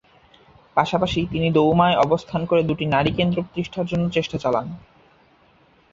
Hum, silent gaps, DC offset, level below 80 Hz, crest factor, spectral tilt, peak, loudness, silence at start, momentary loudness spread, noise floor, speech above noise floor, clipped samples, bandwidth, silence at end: none; none; under 0.1%; -46 dBFS; 20 dB; -7 dB/octave; -2 dBFS; -21 LUFS; 0.75 s; 9 LU; -56 dBFS; 36 dB; under 0.1%; 7.6 kHz; 1.15 s